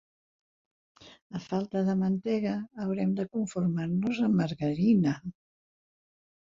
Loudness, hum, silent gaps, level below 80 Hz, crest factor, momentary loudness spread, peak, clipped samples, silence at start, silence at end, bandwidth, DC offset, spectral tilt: -29 LUFS; none; 1.22-1.30 s; -66 dBFS; 16 dB; 9 LU; -14 dBFS; under 0.1%; 1.05 s; 1.2 s; 7.6 kHz; under 0.1%; -8 dB/octave